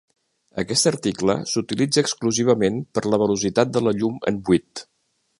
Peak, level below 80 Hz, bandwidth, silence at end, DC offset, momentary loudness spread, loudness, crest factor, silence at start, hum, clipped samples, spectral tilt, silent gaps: -2 dBFS; -54 dBFS; 11.5 kHz; 0.55 s; under 0.1%; 6 LU; -21 LUFS; 20 dB; 0.55 s; none; under 0.1%; -4.5 dB/octave; none